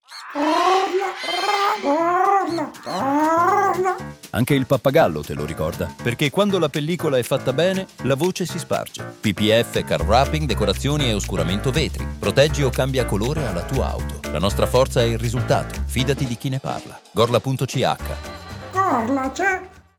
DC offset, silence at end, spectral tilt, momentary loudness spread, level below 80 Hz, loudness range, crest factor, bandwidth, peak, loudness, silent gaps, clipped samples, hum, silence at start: under 0.1%; 0.2 s; -5.5 dB/octave; 9 LU; -34 dBFS; 3 LU; 18 dB; 19 kHz; -4 dBFS; -21 LUFS; none; under 0.1%; none; 0.1 s